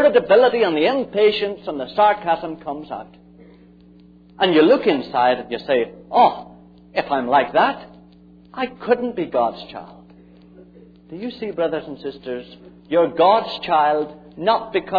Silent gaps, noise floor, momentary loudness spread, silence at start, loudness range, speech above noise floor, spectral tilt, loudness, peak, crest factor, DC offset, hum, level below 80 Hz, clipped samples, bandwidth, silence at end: none; -48 dBFS; 17 LU; 0 s; 8 LU; 29 dB; -7.5 dB/octave; -19 LUFS; -2 dBFS; 18 dB; under 0.1%; none; -56 dBFS; under 0.1%; 5 kHz; 0 s